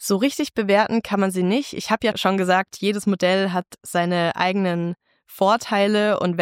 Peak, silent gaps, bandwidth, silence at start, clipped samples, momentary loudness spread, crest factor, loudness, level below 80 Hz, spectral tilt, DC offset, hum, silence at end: -4 dBFS; none; 16.5 kHz; 0 s; under 0.1%; 6 LU; 16 dB; -21 LUFS; -62 dBFS; -5 dB/octave; under 0.1%; none; 0 s